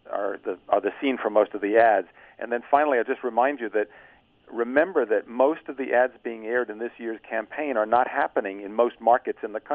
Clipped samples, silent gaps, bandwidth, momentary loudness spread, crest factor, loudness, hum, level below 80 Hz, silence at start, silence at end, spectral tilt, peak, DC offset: under 0.1%; none; 4.2 kHz; 11 LU; 20 dB; -25 LUFS; none; -70 dBFS; 0.1 s; 0 s; -7.5 dB/octave; -4 dBFS; under 0.1%